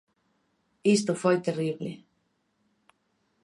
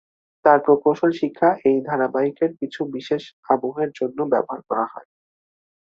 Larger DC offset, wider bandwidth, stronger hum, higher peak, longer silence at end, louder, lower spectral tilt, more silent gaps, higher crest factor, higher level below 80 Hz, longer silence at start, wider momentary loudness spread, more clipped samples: neither; first, 11.5 kHz vs 7.2 kHz; neither; second, -12 dBFS vs -2 dBFS; first, 1.45 s vs 0.95 s; second, -27 LUFS vs -21 LUFS; second, -5.5 dB/octave vs -7.5 dB/octave; second, none vs 3.33-3.43 s; about the same, 20 dB vs 20 dB; second, -76 dBFS vs -68 dBFS; first, 0.85 s vs 0.45 s; first, 14 LU vs 10 LU; neither